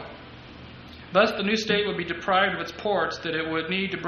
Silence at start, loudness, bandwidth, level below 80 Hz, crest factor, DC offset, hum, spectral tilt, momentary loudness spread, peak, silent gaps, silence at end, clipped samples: 0 s; -25 LUFS; 11.5 kHz; -54 dBFS; 20 dB; under 0.1%; none; -4.5 dB/octave; 21 LU; -6 dBFS; none; 0 s; under 0.1%